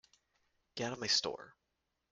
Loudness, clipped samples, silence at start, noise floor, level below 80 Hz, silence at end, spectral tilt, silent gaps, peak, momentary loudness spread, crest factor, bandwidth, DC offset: -35 LUFS; under 0.1%; 0.75 s; -85 dBFS; -76 dBFS; 0.6 s; -2 dB/octave; none; -18 dBFS; 18 LU; 24 dB; 11.5 kHz; under 0.1%